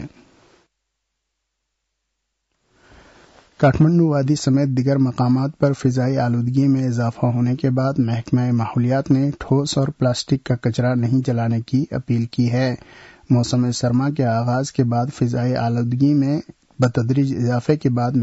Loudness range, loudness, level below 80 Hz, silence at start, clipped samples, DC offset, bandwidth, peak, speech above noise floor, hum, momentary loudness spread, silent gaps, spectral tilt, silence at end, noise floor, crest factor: 2 LU; -19 LUFS; -50 dBFS; 0 s; under 0.1%; under 0.1%; 8 kHz; -6 dBFS; 58 dB; none; 4 LU; none; -7.5 dB/octave; 0 s; -76 dBFS; 14 dB